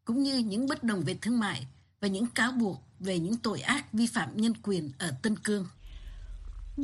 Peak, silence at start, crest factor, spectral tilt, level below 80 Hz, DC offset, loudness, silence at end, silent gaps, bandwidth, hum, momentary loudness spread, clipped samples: -12 dBFS; 0.05 s; 18 dB; -4.5 dB/octave; -50 dBFS; under 0.1%; -31 LUFS; 0 s; none; 12.5 kHz; none; 19 LU; under 0.1%